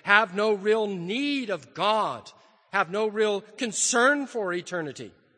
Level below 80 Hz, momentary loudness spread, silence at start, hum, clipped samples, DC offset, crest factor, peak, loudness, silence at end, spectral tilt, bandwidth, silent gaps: -78 dBFS; 12 LU; 0.05 s; none; under 0.1%; under 0.1%; 24 dB; -2 dBFS; -25 LUFS; 0.3 s; -2.5 dB/octave; 9.8 kHz; none